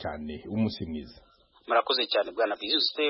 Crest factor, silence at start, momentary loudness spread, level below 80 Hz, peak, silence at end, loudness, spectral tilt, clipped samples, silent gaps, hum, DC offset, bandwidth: 18 dB; 0 s; 12 LU; -56 dBFS; -12 dBFS; 0 s; -28 LUFS; -8.5 dB/octave; under 0.1%; none; none; under 0.1%; 5.8 kHz